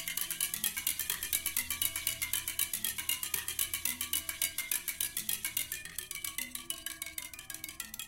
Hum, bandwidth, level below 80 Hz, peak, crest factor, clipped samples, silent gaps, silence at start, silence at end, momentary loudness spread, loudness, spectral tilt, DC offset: none; 17 kHz; -60 dBFS; -10 dBFS; 26 dB; under 0.1%; none; 0 s; 0 s; 8 LU; -34 LUFS; 1 dB/octave; under 0.1%